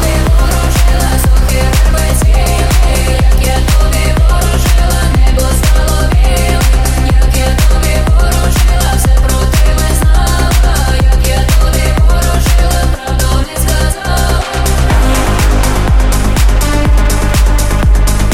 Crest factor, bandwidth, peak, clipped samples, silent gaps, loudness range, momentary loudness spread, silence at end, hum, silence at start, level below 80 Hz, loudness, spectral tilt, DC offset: 8 dB; 16.5 kHz; 0 dBFS; under 0.1%; none; 1 LU; 2 LU; 0 s; none; 0 s; -8 dBFS; -11 LUFS; -4.5 dB/octave; under 0.1%